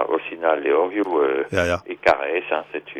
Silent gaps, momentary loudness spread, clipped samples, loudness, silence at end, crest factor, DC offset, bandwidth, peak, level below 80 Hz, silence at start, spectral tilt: none; 5 LU; under 0.1%; -21 LUFS; 0 s; 18 dB; under 0.1%; 12.5 kHz; -4 dBFS; -52 dBFS; 0 s; -5.5 dB/octave